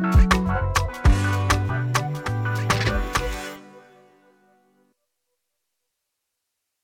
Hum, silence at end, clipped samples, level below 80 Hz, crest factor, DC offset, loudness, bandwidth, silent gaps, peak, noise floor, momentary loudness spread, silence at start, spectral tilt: none; 3.05 s; under 0.1%; -28 dBFS; 18 dB; under 0.1%; -23 LUFS; 17 kHz; none; -6 dBFS; -80 dBFS; 9 LU; 0 s; -5 dB/octave